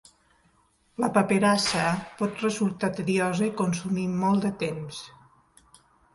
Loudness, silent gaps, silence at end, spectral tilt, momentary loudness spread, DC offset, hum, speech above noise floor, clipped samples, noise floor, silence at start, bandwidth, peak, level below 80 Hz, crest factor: -26 LUFS; none; 1.05 s; -5 dB/octave; 12 LU; under 0.1%; none; 40 dB; under 0.1%; -65 dBFS; 1 s; 11.5 kHz; -8 dBFS; -62 dBFS; 20 dB